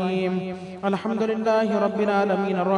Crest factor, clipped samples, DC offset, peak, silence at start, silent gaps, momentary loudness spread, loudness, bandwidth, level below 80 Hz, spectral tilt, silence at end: 14 dB; under 0.1%; under 0.1%; -10 dBFS; 0 s; none; 7 LU; -24 LUFS; 10.5 kHz; -68 dBFS; -7.5 dB/octave; 0 s